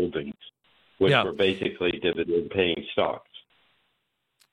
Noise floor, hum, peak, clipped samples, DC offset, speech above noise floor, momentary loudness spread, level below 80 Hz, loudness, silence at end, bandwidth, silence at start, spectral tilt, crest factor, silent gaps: -76 dBFS; none; -4 dBFS; under 0.1%; under 0.1%; 51 dB; 13 LU; -58 dBFS; -25 LUFS; 1.15 s; 10.5 kHz; 0 s; -6.5 dB/octave; 24 dB; none